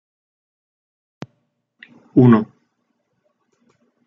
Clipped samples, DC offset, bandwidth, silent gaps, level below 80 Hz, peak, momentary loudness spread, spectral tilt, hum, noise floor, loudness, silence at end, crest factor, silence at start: under 0.1%; under 0.1%; 5.6 kHz; none; -62 dBFS; -2 dBFS; 27 LU; -10.5 dB/octave; none; -70 dBFS; -15 LUFS; 1.6 s; 20 dB; 2.15 s